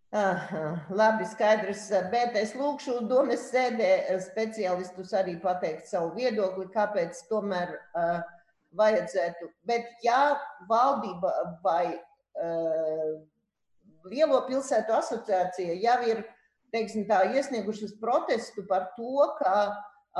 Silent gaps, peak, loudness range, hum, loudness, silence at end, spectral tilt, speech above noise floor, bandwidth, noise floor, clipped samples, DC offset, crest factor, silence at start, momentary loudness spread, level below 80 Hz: none; -12 dBFS; 3 LU; none; -28 LUFS; 0 s; -5 dB/octave; 45 dB; 11.5 kHz; -73 dBFS; under 0.1%; under 0.1%; 16 dB; 0.1 s; 9 LU; -74 dBFS